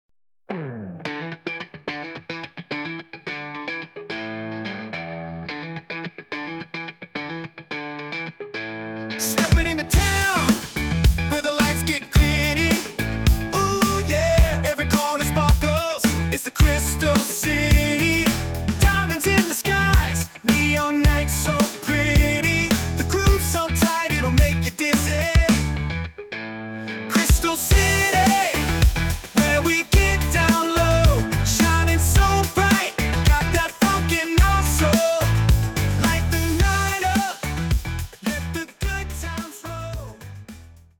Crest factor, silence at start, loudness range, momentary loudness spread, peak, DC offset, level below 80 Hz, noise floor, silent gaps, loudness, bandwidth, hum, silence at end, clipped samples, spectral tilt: 16 dB; 0.5 s; 12 LU; 14 LU; -6 dBFS; under 0.1%; -26 dBFS; -43 dBFS; none; -20 LUFS; 19.5 kHz; none; 0.35 s; under 0.1%; -4.5 dB/octave